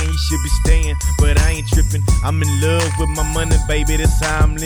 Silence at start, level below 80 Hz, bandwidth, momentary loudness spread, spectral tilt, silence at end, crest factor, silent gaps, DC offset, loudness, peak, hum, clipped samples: 0 s; -16 dBFS; over 20 kHz; 3 LU; -4.5 dB/octave; 0 s; 14 dB; none; under 0.1%; -17 LUFS; 0 dBFS; none; under 0.1%